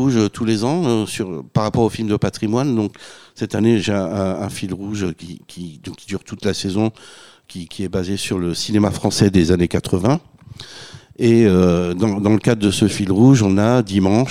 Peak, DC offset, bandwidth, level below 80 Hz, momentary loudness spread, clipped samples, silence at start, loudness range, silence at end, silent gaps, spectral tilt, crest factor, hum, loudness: 0 dBFS; 0.4%; 15 kHz; -44 dBFS; 19 LU; under 0.1%; 0 s; 9 LU; 0 s; none; -6 dB/octave; 16 dB; none; -18 LUFS